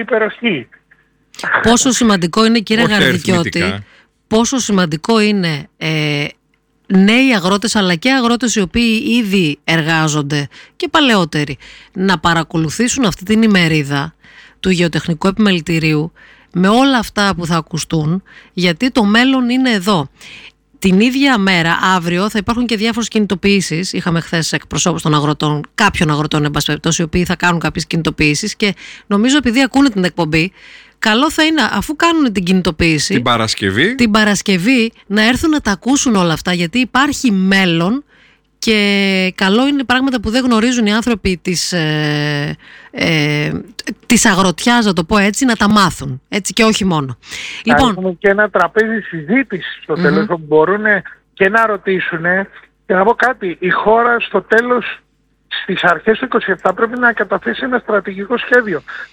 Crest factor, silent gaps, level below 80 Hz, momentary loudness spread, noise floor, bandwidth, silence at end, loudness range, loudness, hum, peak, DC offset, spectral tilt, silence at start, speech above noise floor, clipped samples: 14 dB; none; -40 dBFS; 8 LU; -59 dBFS; 18.5 kHz; 0.05 s; 2 LU; -14 LUFS; none; 0 dBFS; under 0.1%; -4.5 dB/octave; 0 s; 45 dB; under 0.1%